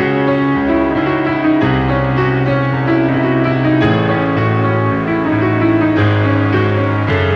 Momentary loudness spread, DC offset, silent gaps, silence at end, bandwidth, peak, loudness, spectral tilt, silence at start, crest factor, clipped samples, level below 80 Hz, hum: 2 LU; under 0.1%; none; 0 s; 6.2 kHz; -2 dBFS; -14 LUFS; -9 dB/octave; 0 s; 12 dB; under 0.1%; -36 dBFS; none